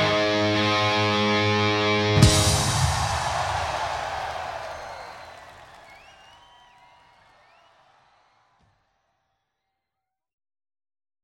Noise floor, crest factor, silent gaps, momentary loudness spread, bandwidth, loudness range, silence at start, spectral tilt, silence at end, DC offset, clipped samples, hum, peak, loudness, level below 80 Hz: -85 dBFS; 24 dB; none; 20 LU; 16 kHz; 20 LU; 0 s; -4 dB/octave; 5.3 s; under 0.1%; under 0.1%; none; -2 dBFS; -22 LUFS; -40 dBFS